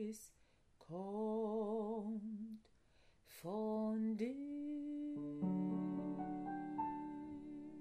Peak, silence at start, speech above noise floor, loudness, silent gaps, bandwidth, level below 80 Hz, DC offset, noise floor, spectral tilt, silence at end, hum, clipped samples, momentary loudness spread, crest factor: -30 dBFS; 0 s; 29 dB; -44 LUFS; none; 13 kHz; -74 dBFS; under 0.1%; -71 dBFS; -8 dB/octave; 0 s; none; under 0.1%; 12 LU; 14 dB